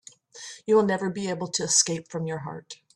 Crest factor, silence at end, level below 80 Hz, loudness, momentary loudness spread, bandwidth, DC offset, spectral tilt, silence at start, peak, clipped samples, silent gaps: 22 dB; 0.2 s; -68 dBFS; -25 LUFS; 19 LU; 12.5 kHz; under 0.1%; -3 dB/octave; 0.35 s; -6 dBFS; under 0.1%; none